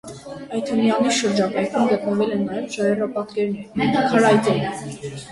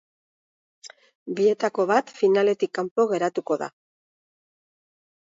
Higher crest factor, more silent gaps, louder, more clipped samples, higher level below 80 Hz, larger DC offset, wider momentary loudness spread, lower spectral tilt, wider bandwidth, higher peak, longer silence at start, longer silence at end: about the same, 18 dB vs 20 dB; second, none vs 1.15-1.26 s, 2.91-2.96 s; first, -20 LUFS vs -23 LUFS; neither; first, -56 dBFS vs -78 dBFS; neither; first, 13 LU vs 10 LU; about the same, -5 dB/octave vs -5.5 dB/octave; first, 11.5 kHz vs 7.8 kHz; first, -2 dBFS vs -6 dBFS; second, 0.05 s vs 0.85 s; second, 0 s vs 1.7 s